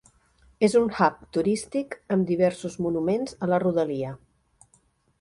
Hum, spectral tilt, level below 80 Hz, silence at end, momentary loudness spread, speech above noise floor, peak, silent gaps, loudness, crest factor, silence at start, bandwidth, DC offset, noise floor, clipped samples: none; -6.5 dB/octave; -60 dBFS; 1.05 s; 10 LU; 40 dB; -6 dBFS; none; -25 LUFS; 18 dB; 0.6 s; 11.5 kHz; under 0.1%; -65 dBFS; under 0.1%